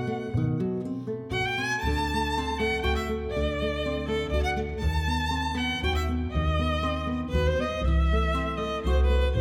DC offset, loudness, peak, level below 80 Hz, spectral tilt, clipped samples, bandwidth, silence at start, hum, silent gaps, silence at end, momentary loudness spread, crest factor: under 0.1%; -27 LUFS; -12 dBFS; -30 dBFS; -6 dB/octave; under 0.1%; 14 kHz; 0 s; none; none; 0 s; 5 LU; 14 dB